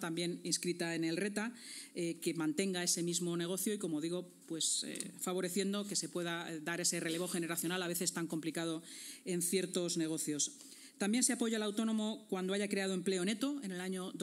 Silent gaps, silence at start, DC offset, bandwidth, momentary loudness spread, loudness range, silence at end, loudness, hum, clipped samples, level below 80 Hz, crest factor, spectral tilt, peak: none; 0 s; under 0.1%; 16 kHz; 7 LU; 2 LU; 0 s; -37 LUFS; none; under 0.1%; under -90 dBFS; 22 dB; -3.5 dB/octave; -16 dBFS